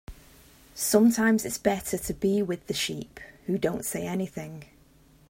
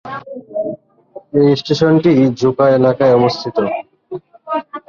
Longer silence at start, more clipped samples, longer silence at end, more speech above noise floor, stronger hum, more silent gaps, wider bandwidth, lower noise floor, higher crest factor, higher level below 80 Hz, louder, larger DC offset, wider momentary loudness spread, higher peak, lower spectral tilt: about the same, 0.1 s vs 0.05 s; neither; first, 0.65 s vs 0.1 s; first, 31 dB vs 27 dB; neither; neither; first, 16.5 kHz vs 7.2 kHz; first, -58 dBFS vs -39 dBFS; first, 20 dB vs 14 dB; about the same, -54 dBFS vs -52 dBFS; second, -27 LUFS vs -14 LUFS; neither; about the same, 19 LU vs 19 LU; second, -8 dBFS vs 0 dBFS; second, -4.5 dB/octave vs -7.5 dB/octave